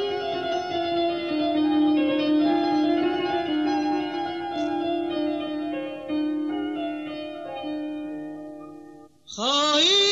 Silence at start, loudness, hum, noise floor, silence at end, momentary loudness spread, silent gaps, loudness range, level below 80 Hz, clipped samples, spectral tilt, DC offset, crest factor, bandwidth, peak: 0 s; -25 LUFS; none; -47 dBFS; 0 s; 13 LU; none; 8 LU; -62 dBFS; under 0.1%; -3 dB/octave; under 0.1%; 14 dB; 8 kHz; -10 dBFS